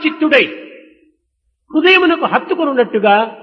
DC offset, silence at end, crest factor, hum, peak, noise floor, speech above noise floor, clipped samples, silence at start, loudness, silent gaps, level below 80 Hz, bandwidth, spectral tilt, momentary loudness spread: under 0.1%; 0.05 s; 14 dB; none; 0 dBFS; -67 dBFS; 54 dB; under 0.1%; 0 s; -12 LUFS; none; -62 dBFS; 6.4 kHz; -6 dB/octave; 9 LU